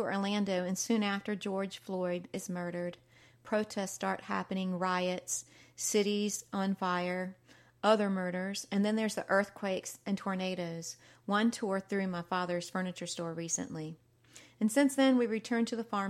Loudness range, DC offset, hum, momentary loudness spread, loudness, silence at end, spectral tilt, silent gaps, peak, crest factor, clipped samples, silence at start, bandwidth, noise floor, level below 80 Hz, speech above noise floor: 3 LU; under 0.1%; none; 9 LU; -34 LUFS; 0 s; -4.5 dB/octave; none; -14 dBFS; 20 dB; under 0.1%; 0 s; 15 kHz; -59 dBFS; -78 dBFS; 26 dB